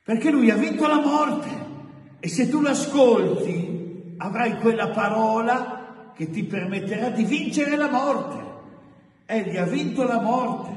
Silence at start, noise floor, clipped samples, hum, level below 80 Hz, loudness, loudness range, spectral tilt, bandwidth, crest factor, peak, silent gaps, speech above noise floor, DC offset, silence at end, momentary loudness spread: 0.1 s; -52 dBFS; under 0.1%; none; -68 dBFS; -22 LUFS; 4 LU; -5.5 dB/octave; 11.5 kHz; 18 dB; -4 dBFS; none; 30 dB; under 0.1%; 0 s; 15 LU